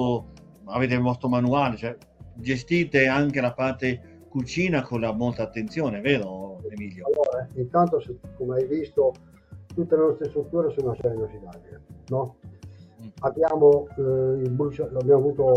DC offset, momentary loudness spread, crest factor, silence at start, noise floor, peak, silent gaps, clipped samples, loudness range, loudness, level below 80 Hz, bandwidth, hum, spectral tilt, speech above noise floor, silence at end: under 0.1%; 15 LU; 18 dB; 0 s; -45 dBFS; -6 dBFS; none; under 0.1%; 3 LU; -24 LUFS; -54 dBFS; 8 kHz; none; -7.5 dB/octave; 21 dB; 0 s